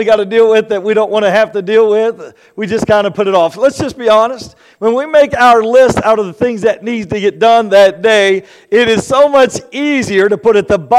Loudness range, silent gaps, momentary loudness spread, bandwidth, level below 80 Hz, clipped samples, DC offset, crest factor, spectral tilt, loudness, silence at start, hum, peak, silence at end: 3 LU; none; 9 LU; 13 kHz; -46 dBFS; under 0.1%; under 0.1%; 10 dB; -4.5 dB/octave; -10 LUFS; 0 s; none; 0 dBFS; 0 s